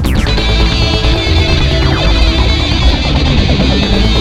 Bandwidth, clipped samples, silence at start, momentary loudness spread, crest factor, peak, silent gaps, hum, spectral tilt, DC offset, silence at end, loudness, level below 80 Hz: 12.5 kHz; under 0.1%; 0 s; 1 LU; 10 dB; 0 dBFS; none; none; -5.5 dB/octave; 0.4%; 0 s; -11 LUFS; -12 dBFS